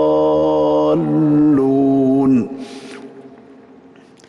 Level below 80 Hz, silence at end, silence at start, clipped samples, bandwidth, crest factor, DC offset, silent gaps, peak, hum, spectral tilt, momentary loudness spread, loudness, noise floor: -50 dBFS; 1 s; 0 s; under 0.1%; 7 kHz; 8 dB; under 0.1%; none; -8 dBFS; none; -9 dB/octave; 19 LU; -14 LUFS; -44 dBFS